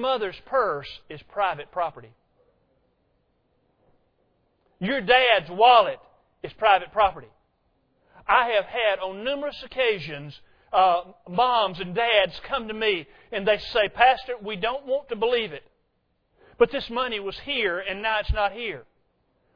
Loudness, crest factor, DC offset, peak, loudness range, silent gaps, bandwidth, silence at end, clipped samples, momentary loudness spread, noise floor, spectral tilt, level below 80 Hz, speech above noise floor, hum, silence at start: -23 LUFS; 22 dB; under 0.1%; -2 dBFS; 9 LU; none; 5.4 kHz; 0.75 s; under 0.1%; 14 LU; -71 dBFS; -6 dB/octave; -46 dBFS; 47 dB; none; 0 s